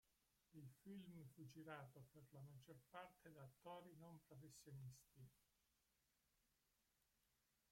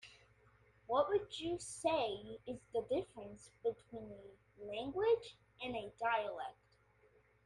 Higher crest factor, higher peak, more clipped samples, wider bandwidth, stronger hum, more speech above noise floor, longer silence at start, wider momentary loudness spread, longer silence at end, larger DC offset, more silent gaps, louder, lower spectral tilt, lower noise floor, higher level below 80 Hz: about the same, 22 dB vs 20 dB; second, -42 dBFS vs -22 dBFS; neither; first, 16.5 kHz vs 11.5 kHz; second, none vs 60 Hz at -70 dBFS; second, 25 dB vs 31 dB; about the same, 0.05 s vs 0.05 s; second, 6 LU vs 18 LU; first, 2 s vs 0.95 s; neither; neither; second, -63 LUFS vs -40 LUFS; first, -6 dB/octave vs -4 dB/octave; first, -87 dBFS vs -71 dBFS; second, -88 dBFS vs -70 dBFS